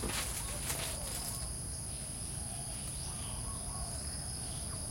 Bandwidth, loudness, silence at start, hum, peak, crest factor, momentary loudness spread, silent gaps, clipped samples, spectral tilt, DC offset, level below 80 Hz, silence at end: 16.5 kHz; -38 LUFS; 0 s; none; -20 dBFS; 18 dB; 4 LU; none; under 0.1%; -2.5 dB/octave; under 0.1%; -48 dBFS; 0 s